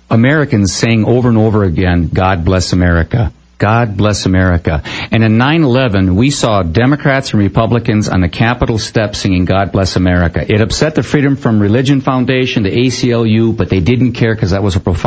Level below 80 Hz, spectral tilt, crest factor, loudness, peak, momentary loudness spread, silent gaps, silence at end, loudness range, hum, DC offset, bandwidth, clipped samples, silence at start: -24 dBFS; -6 dB/octave; 10 dB; -12 LUFS; 0 dBFS; 3 LU; none; 0 s; 1 LU; none; under 0.1%; 8 kHz; under 0.1%; 0.1 s